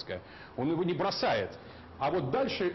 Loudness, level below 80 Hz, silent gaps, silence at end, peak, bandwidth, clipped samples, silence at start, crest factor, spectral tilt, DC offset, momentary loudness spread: -32 LUFS; -60 dBFS; none; 0 s; -20 dBFS; 6.2 kHz; under 0.1%; 0 s; 12 dB; -6.5 dB/octave; under 0.1%; 14 LU